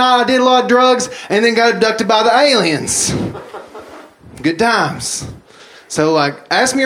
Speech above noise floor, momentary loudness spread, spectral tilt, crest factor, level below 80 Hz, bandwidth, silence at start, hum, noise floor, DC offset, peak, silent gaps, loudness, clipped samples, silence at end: 28 dB; 13 LU; -3 dB/octave; 14 dB; -48 dBFS; 15.5 kHz; 0 s; none; -41 dBFS; under 0.1%; 0 dBFS; none; -13 LUFS; under 0.1%; 0 s